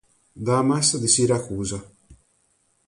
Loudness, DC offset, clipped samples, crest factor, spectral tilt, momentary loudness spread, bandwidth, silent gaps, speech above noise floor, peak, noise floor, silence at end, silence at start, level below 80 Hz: -21 LUFS; under 0.1%; under 0.1%; 18 dB; -4 dB/octave; 13 LU; 11.5 kHz; none; 45 dB; -6 dBFS; -66 dBFS; 0.75 s; 0.35 s; -52 dBFS